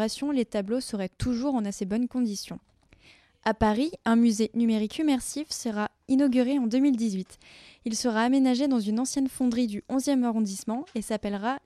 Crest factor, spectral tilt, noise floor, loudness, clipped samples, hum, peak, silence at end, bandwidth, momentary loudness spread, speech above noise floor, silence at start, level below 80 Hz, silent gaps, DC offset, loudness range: 18 dB; -5 dB/octave; -58 dBFS; -27 LUFS; under 0.1%; none; -8 dBFS; 0.1 s; 13.5 kHz; 9 LU; 32 dB; 0 s; -52 dBFS; none; under 0.1%; 4 LU